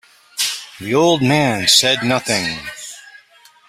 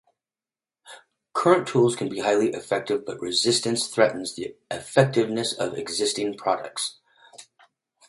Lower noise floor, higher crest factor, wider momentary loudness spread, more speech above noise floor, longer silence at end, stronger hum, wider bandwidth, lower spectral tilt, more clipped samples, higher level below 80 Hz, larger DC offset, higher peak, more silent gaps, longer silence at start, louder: second, -49 dBFS vs under -90 dBFS; about the same, 18 dB vs 22 dB; first, 18 LU vs 11 LU; second, 33 dB vs over 66 dB; second, 0.5 s vs 0.65 s; neither; first, 16 kHz vs 11.5 kHz; about the same, -3 dB/octave vs -4 dB/octave; neither; first, -54 dBFS vs -66 dBFS; neither; about the same, 0 dBFS vs -2 dBFS; neither; second, 0.35 s vs 0.85 s; first, -15 LUFS vs -24 LUFS